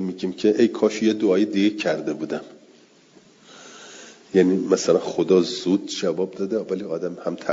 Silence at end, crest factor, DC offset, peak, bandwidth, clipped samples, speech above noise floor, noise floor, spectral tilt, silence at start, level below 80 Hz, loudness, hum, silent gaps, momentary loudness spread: 0 s; 18 dB; under 0.1%; -4 dBFS; 7.8 kHz; under 0.1%; 32 dB; -53 dBFS; -5.5 dB/octave; 0 s; -70 dBFS; -22 LUFS; none; none; 13 LU